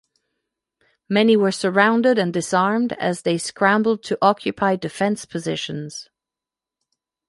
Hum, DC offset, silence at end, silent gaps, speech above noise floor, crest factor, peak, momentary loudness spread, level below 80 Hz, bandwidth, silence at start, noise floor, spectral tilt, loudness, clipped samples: none; under 0.1%; 1.25 s; none; 69 dB; 20 dB; -2 dBFS; 10 LU; -64 dBFS; 11.5 kHz; 1.1 s; -88 dBFS; -5 dB/octave; -20 LUFS; under 0.1%